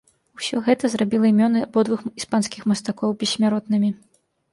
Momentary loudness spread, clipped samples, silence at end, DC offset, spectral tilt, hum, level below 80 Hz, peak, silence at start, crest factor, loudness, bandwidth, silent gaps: 8 LU; under 0.1%; 0.55 s; under 0.1%; -5 dB/octave; none; -64 dBFS; -4 dBFS; 0.4 s; 16 dB; -21 LUFS; 11.5 kHz; none